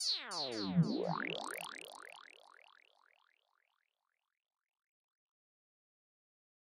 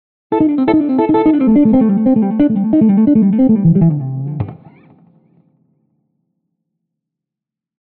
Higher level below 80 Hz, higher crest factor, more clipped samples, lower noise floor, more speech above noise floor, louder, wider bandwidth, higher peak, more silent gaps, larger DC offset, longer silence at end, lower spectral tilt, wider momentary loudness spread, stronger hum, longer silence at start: second, -82 dBFS vs -46 dBFS; first, 22 dB vs 10 dB; neither; about the same, -88 dBFS vs -85 dBFS; second, 51 dB vs 74 dB; second, -38 LUFS vs -12 LUFS; first, 15.5 kHz vs 4.2 kHz; second, -22 dBFS vs -4 dBFS; neither; neither; first, 4.4 s vs 3.25 s; second, -4.5 dB/octave vs -10 dB/octave; first, 21 LU vs 11 LU; neither; second, 0 s vs 0.3 s